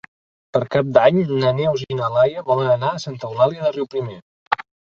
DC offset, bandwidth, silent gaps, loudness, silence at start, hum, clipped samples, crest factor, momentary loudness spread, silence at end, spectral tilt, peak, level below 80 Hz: under 0.1%; 7.2 kHz; 4.22-4.51 s; -19 LUFS; 0.55 s; none; under 0.1%; 18 dB; 11 LU; 0.35 s; -7 dB/octave; -2 dBFS; -56 dBFS